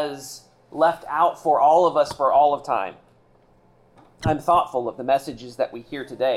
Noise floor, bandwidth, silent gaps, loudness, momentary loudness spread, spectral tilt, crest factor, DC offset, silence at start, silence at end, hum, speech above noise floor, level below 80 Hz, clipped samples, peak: -57 dBFS; 14.5 kHz; none; -21 LUFS; 17 LU; -5.5 dB/octave; 14 dB; under 0.1%; 0 s; 0 s; none; 36 dB; -54 dBFS; under 0.1%; -8 dBFS